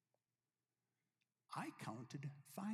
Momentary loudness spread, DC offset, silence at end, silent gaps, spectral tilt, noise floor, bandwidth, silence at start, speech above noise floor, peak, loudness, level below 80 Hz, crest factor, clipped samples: 3 LU; under 0.1%; 0 s; none; -6 dB/octave; under -90 dBFS; 15.5 kHz; 1.5 s; over 40 dB; -34 dBFS; -52 LUFS; under -90 dBFS; 20 dB; under 0.1%